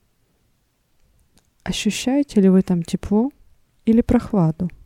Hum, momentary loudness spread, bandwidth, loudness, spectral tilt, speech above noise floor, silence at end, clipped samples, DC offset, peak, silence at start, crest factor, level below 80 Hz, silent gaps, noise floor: none; 11 LU; 13 kHz; -19 LUFS; -6.5 dB/octave; 47 dB; 0.1 s; under 0.1%; under 0.1%; -4 dBFS; 1.65 s; 18 dB; -40 dBFS; none; -65 dBFS